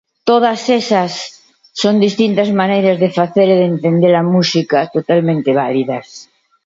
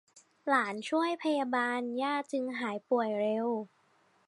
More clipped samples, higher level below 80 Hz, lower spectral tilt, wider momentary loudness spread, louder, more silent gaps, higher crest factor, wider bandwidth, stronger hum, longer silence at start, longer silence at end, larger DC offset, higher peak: neither; first, -62 dBFS vs -88 dBFS; first, -6 dB/octave vs -4.5 dB/octave; about the same, 7 LU vs 6 LU; first, -13 LUFS vs -32 LUFS; neither; about the same, 14 dB vs 18 dB; second, 7.8 kHz vs 11.5 kHz; neither; second, 0.25 s vs 0.45 s; second, 0.4 s vs 0.6 s; neither; first, 0 dBFS vs -14 dBFS